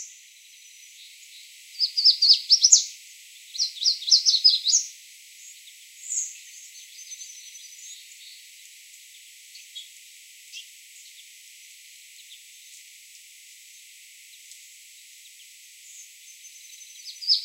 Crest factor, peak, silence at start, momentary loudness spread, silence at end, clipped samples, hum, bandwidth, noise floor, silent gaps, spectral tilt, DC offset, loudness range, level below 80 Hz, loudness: 28 dB; 0 dBFS; 0 s; 29 LU; 0 s; under 0.1%; none; 16 kHz; -50 dBFS; none; 14 dB/octave; under 0.1%; 26 LU; under -90 dBFS; -18 LUFS